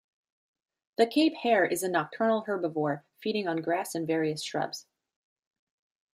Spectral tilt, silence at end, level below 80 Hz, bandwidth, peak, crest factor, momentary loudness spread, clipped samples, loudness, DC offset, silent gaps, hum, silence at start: -4.5 dB/octave; 1.3 s; -80 dBFS; 15.5 kHz; -10 dBFS; 20 dB; 9 LU; under 0.1%; -29 LUFS; under 0.1%; none; none; 1 s